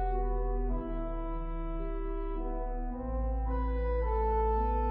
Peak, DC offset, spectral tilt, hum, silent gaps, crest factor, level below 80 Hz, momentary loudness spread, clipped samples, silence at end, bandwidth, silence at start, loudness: -20 dBFS; under 0.1%; -12 dB/octave; none; none; 12 dB; -32 dBFS; 8 LU; under 0.1%; 0 s; 3.7 kHz; 0 s; -35 LUFS